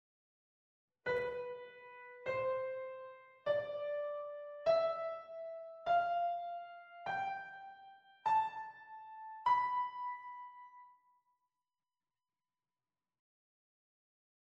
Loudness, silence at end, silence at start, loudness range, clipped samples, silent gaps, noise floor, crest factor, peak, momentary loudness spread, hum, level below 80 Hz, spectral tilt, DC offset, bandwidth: -39 LUFS; 3.55 s; 1.05 s; 5 LU; under 0.1%; none; under -90 dBFS; 20 dB; -22 dBFS; 19 LU; none; -80 dBFS; -4.5 dB/octave; under 0.1%; 7.8 kHz